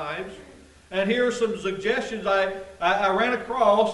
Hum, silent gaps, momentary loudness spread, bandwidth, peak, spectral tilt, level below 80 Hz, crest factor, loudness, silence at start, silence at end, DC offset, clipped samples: none; none; 10 LU; 11.5 kHz; -6 dBFS; -4.5 dB/octave; -56 dBFS; 18 dB; -24 LUFS; 0 s; 0 s; under 0.1%; under 0.1%